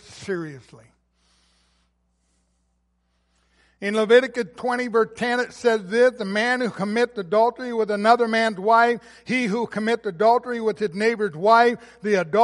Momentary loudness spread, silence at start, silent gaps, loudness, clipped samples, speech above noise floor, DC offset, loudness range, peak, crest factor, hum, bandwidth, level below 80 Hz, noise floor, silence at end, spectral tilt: 10 LU; 0.1 s; none; -21 LUFS; under 0.1%; 48 dB; under 0.1%; 5 LU; -4 dBFS; 18 dB; none; 11.5 kHz; -66 dBFS; -69 dBFS; 0 s; -5 dB/octave